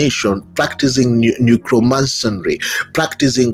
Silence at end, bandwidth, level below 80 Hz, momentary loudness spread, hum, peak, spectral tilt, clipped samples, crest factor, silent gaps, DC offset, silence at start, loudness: 0 s; 16 kHz; -44 dBFS; 5 LU; none; 0 dBFS; -5 dB/octave; under 0.1%; 14 dB; none; under 0.1%; 0 s; -15 LUFS